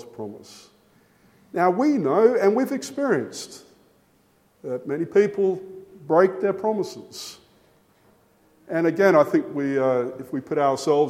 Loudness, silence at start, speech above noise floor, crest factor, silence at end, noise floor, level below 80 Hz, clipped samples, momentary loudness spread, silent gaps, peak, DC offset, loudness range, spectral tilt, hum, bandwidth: -22 LUFS; 0 s; 40 dB; 20 dB; 0 s; -61 dBFS; -72 dBFS; under 0.1%; 19 LU; none; -4 dBFS; under 0.1%; 3 LU; -6 dB/octave; none; 15.5 kHz